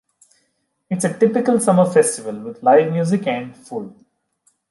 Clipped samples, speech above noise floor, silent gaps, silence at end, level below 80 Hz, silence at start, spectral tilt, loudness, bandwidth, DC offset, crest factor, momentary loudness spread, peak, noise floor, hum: under 0.1%; 52 dB; none; 0.8 s; -66 dBFS; 0.9 s; -6 dB/octave; -17 LUFS; 11.5 kHz; under 0.1%; 16 dB; 16 LU; -2 dBFS; -69 dBFS; none